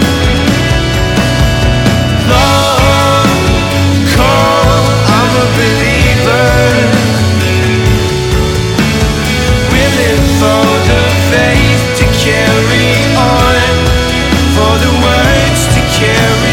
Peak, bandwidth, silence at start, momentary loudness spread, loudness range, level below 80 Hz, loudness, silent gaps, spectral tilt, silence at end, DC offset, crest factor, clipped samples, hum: 0 dBFS; 17.5 kHz; 0 s; 3 LU; 2 LU; -18 dBFS; -9 LUFS; none; -5 dB/octave; 0 s; under 0.1%; 8 dB; under 0.1%; none